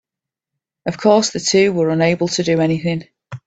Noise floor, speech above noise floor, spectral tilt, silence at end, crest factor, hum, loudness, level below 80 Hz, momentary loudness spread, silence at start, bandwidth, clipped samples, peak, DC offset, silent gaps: -86 dBFS; 70 dB; -4.5 dB/octave; 0.1 s; 18 dB; none; -16 LUFS; -56 dBFS; 13 LU; 0.85 s; 9 kHz; under 0.1%; 0 dBFS; under 0.1%; none